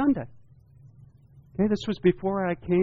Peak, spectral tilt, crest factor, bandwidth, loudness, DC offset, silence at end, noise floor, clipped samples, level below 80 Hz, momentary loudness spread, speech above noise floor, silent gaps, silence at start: -8 dBFS; -8 dB/octave; 18 dB; 7.6 kHz; -26 LUFS; under 0.1%; 0 s; -54 dBFS; under 0.1%; -54 dBFS; 11 LU; 29 dB; none; 0 s